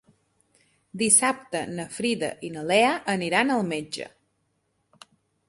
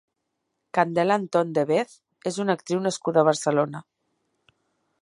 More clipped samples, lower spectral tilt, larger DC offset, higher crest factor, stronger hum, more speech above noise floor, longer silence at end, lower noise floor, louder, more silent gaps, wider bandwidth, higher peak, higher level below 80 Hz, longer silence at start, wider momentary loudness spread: neither; second, -2.5 dB/octave vs -5.5 dB/octave; neither; about the same, 22 dB vs 20 dB; neither; second, 48 dB vs 56 dB; first, 1.4 s vs 1.25 s; second, -73 dBFS vs -79 dBFS; about the same, -24 LUFS vs -24 LUFS; neither; about the same, 12 kHz vs 11.5 kHz; about the same, -4 dBFS vs -4 dBFS; first, -68 dBFS vs -74 dBFS; first, 0.95 s vs 0.75 s; first, 16 LU vs 10 LU